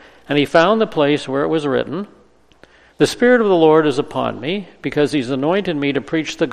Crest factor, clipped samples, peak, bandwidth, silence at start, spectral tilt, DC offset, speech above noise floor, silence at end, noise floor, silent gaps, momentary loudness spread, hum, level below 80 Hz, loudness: 18 dB; under 0.1%; 0 dBFS; 13.5 kHz; 0.3 s; -5.5 dB/octave; under 0.1%; 34 dB; 0 s; -50 dBFS; none; 11 LU; none; -52 dBFS; -17 LUFS